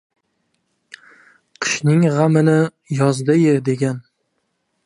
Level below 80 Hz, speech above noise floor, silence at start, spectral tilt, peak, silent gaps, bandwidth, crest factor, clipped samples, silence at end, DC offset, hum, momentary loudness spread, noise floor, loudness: -66 dBFS; 55 dB; 1.6 s; -6.5 dB/octave; -2 dBFS; none; 11 kHz; 16 dB; under 0.1%; 0.85 s; under 0.1%; none; 8 LU; -70 dBFS; -17 LUFS